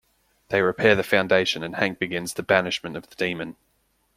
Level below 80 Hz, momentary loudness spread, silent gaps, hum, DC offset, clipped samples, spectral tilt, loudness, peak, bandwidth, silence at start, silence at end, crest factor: -60 dBFS; 10 LU; none; none; under 0.1%; under 0.1%; -4.5 dB/octave; -23 LUFS; -2 dBFS; 16 kHz; 0.5 s; 0.65 s; 22 dB